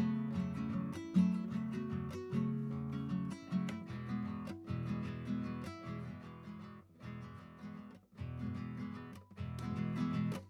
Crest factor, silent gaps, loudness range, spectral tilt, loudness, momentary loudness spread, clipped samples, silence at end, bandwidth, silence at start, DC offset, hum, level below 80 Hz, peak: 18 dB; none; 9 LU; -8 dB/octave; -41 LUFS; 14 LU; under 0.1%; 0 s; 12 kHz; 0 s; under 0.1%; none; -62 dBFS; -20 dBFS